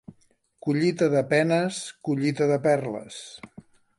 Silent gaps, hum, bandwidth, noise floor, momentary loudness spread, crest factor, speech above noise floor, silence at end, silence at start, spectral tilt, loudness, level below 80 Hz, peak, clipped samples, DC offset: none; none; 11.5 kHz; -64 dBFS; 18 LU; 18 dB; 40 dB; 0.5 s; 0.1 s; -6 dB/octave; -24 LUFS; -68 dBFS; -6 dBFS; under 0.1%; under 0.1%